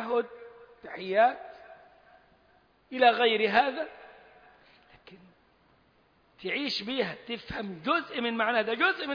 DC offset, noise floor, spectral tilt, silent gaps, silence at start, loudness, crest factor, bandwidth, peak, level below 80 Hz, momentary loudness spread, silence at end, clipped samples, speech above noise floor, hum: under 0.1%; -65 dBFS; -5 dB/octave; none; 0 s; -28 LUFS; 22 dB; 5.2 kHz; -8 dBFS; -66 dBFS; 17 LU; 0 s; under 0.1%; 37 dB; none